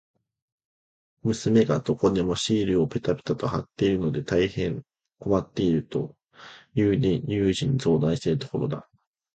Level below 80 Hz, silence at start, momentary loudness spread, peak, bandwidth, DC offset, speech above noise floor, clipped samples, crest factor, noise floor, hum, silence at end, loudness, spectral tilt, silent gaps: -50 dBFS; 1.25 s; 9 LU; -8 dBFS; 9.2 kHz; under 0.1%; 25 dB; under 0.1%; 16 dB; -49 dBFS; none; 0.55 s; -25 LUFS; -6.5 dB/octave; none